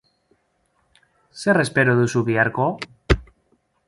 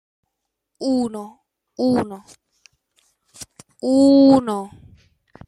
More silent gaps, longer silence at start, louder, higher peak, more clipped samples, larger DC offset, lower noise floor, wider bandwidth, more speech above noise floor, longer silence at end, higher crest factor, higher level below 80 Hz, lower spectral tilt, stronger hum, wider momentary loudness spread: neither; first, 1.35 s vs 0.8 s; about the same, -20 LUFS vs -18 LUFS; about the same, -2 dBFS vs -2 dBFS; neither; neither; second, -67 dBFS vs -79 dBFS; about the same, 11.5 kHz vs 11.5 kHz; second, 48 dB vs 62 dB; second, 0.65 s vs 0.8 s; about the same, 22 dB vs 18 dB; first, -36 dBFS vs -60 dBFS; about the same, -6 dB/octave vs -6 dB/octave; neither; second, 7 LU vs 27 LU